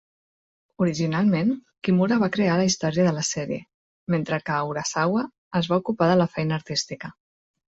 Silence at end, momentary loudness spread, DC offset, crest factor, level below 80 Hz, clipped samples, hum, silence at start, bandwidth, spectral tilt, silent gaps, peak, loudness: 0.6 s; 8 LU; under 0.1%; 16 dB; -60 dBFS; under 0.1%; none; 0.8 s; 8 kHz; -5.5 dB/octave; 3.74-4.07 s, 5.38-5.51 s; -8 dBFS; -24 LUFS